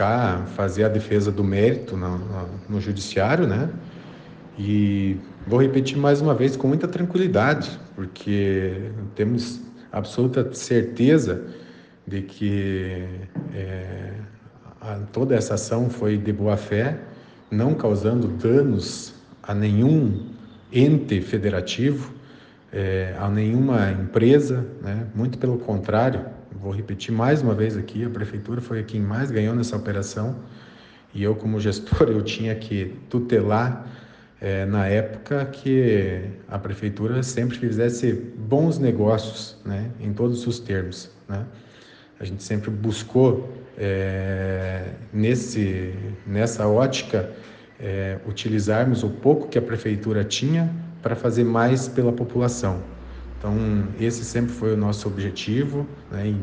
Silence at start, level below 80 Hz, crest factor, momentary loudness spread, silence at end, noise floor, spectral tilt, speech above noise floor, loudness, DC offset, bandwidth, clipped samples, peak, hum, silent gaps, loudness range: 0 s; -48 dBFS; 20 dB; 13 LU; 0 s; -48 dBFS; -7 dB/octave; 26 dB; -23 LUFS; under 0.1%; 9.6 kHz; under 0.1%; -4 dBFS; none; none; 4 LU